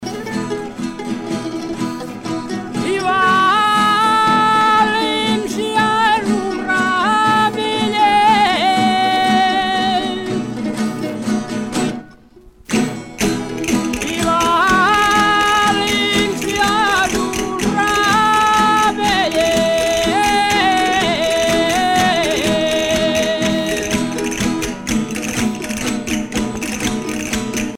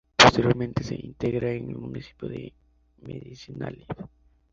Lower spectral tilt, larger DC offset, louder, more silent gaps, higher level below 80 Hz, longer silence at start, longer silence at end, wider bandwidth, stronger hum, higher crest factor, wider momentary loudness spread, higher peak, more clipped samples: about the same, -3.5 dB/octave vs -4 dB/octave; neither; first, -16 LUFS vs -24 LUFS; neither; first, -40 dBFS vs -48 dBFS; second, 0 s vs 0.2 s; second, 0 s vs 0.45 s; first, 17 kHz vs 8.2 kHz; neither; second, 14 dB vs 26 dB; second, 10 LU vs 25 LU; about the same, -2 dBFS vs 0 dBFS; neither